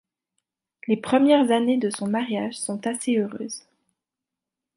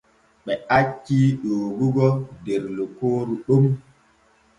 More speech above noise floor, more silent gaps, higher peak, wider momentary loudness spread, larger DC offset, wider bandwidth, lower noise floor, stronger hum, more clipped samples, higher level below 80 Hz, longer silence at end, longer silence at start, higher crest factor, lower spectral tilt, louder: first, 65 dB vs 38 dB; neither; about the same, -6 dBFS vs -4 dBFS; first, 16 LU vs 10 LU; neither; first, 11.5 kHz vs 9.2 kHz; first, -87 dBFS vs -59 dBFS; neither; neither; second, -72 dBFS vs -56 dBFS; first, 1.15 s vs 0.8 s; first, 0.9 s vs 0.45 s; about the same, 18 dB vs 18 dB; second, -4.5 dB/octave vs -8.5 dB/octave; about the same, -23 LUFS vs -22 LUFS